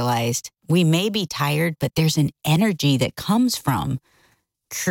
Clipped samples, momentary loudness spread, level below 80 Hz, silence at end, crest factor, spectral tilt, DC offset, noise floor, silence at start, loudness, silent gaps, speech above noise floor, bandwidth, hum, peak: under 0.1%; 8 LU; -52 dBFS; 0 s; 16 dB; -5 dB/octave; under 0.1%; -63 dBFS; 0 s; -21 LUFS; none; 42 dB; 17 kHz; none; -6 dBFS